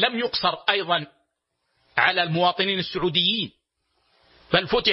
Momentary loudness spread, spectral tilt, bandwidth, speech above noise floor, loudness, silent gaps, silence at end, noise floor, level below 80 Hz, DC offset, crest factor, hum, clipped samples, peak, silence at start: 7 LU; -7.5 dB/octave; 6 kHz; 53 dB; -22 LUFS; none; 0 s; -76 dBFS; -54 dBFS; under 0.1%; 22 dB; none; under 0.1%; -2 dBFS; 0 s